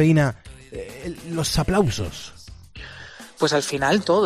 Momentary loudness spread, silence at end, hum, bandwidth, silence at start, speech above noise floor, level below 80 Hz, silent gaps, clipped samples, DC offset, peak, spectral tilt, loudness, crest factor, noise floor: 20 LU; 0 s; none; 14 kHz; 0 s; 21 dB; -40 dBFS; none; under 0.1%; under 0.1%; -6 dBFS; -5 dB/octave; -22 LUFS; 16 dB; -41 dBFS